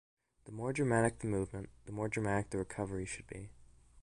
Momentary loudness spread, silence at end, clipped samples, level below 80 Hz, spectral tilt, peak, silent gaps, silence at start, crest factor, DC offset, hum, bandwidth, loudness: 17 LU; 0 s; under 0.1%; -58 dBFS; -6.5 dB/octave; -18 dBFS; none; 0.45 s; 20 dB; under 0.1%; none; 11.5 kHz; -37 LUFS